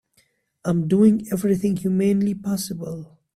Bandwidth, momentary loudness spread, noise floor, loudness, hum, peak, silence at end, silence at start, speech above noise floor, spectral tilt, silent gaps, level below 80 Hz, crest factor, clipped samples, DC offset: 14.5 kHz; 14 LU; -64 dBFS; -21 LUFS; none; -6 dBFS; 0.3 s; 0.65 s; 44 dB; -7.5 dB/octave; none; -56 dBFS; 16 dB; under 0.1%; under 0.1%